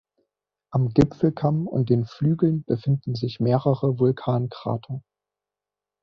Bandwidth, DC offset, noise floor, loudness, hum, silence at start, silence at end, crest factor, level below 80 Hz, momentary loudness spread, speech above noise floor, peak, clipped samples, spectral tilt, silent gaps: 6.8 kHz; under 0.1%; -89 dBFS; -23 LUFS; 50 Hz at -45 dBFS; 0.7 s; 1.05 s; 20 dB; -52 dBFS; 8 LU; 67 dB; -4 dBFS; under 0.1%; -10 dB/octave; none